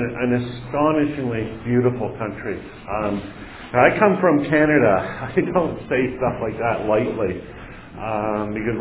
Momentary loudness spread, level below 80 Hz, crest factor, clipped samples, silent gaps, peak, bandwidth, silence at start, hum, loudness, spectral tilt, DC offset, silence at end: 14 LU; -44 dBFS; 20 dB; under 0.1%; none; 0 dBFS; 4 kHz; 0 s; none; -21 LUFS; -11 dB/octave; under 0.1%; 0 s